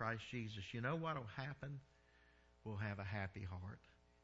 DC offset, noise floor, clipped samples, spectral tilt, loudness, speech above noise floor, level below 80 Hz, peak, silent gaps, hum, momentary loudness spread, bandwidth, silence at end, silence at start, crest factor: under 0.1%; -71 dBFS; under 0.1%; -5 dB/octave; -47 LUFS; 24 dB; -70 dBFS; -28 dBFS; none; none; 12 LU; 7.6 kHz; 0.3 s; 0 s; 20 dB